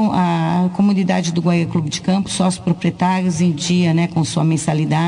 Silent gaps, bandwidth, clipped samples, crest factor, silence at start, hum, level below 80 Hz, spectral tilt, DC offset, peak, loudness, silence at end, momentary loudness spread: none; 10.5 kHz; under 0.1%; 10 dB; 0 s; none; -52 dBFS; -6 dB/octave; under 0.1%; -6 dBFS; -17 LUFS; 0 s; 3 LU